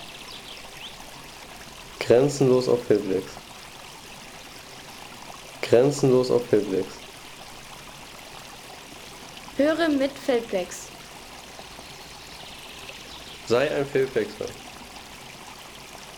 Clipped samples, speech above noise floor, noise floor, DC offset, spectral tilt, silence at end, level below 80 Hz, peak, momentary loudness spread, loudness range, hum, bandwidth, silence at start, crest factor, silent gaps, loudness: under 0.1%; 20 dB; -42 dBFS; under 0.1%; -5 dB/octave; 0 s; -56 dBFS; -6 dBFS; 21 LU; 6 LU; none; 19.5 kHz; 0 s; 22 dB; none; -23 LUFS